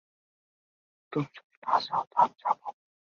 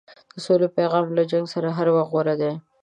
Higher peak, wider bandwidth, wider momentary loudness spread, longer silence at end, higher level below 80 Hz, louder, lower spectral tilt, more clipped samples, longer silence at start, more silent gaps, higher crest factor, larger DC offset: about the same, -10 dBFS vs -8 dBFS; second, 7 kHz vs 9.6 kHz; first, 14 LU vs 6 LU; first, 0.45 s vs 0.25 s; about the same, -78 dBFS vs -74 dBFS; second, -30 LUFS vs -22 LUFS; about the same, -6.5 dB/octave vs -7.5 dB/octave; neither; first, 1.1 s vs 0.35 s; first, 1.44-1.50 s, 1.57-1.62 s, 2.07-2.11 s vs none; first, 22 dB vs 14 dB; neither